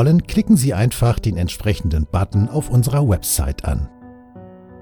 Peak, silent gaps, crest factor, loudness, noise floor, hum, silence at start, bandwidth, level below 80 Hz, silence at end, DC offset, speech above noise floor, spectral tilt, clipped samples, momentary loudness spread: -4 dBFS; none; 14 dB; -18 LUFS; -40 dBFS; none; 0 s; 19 kHz; -30 dBFS; 0.1 s; under 0.1%; 23 dB; -6 dB/octave; under 0.1%; 8 LU